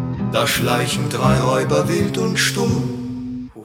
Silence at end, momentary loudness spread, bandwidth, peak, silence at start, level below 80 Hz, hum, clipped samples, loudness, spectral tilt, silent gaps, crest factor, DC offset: 0 s; 10 LU; 17.5 kHz; -2 dBFS; 0 s; -42 dBFS; none; under 0.1%; -18 LUFS; -5 dB/octave; none; 16 dB; under 0.1%